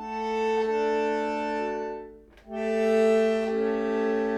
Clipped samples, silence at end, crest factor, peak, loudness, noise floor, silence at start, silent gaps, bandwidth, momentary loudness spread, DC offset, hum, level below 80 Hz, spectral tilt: under 0.1%; 0 s; 14 dB; -12 dBFS; -26 LUFS; -46 dBFS; 0 s; none; 10 kHz; 12 LU; under 0.1%; none; -58 dBFS; -5.5 dB/octave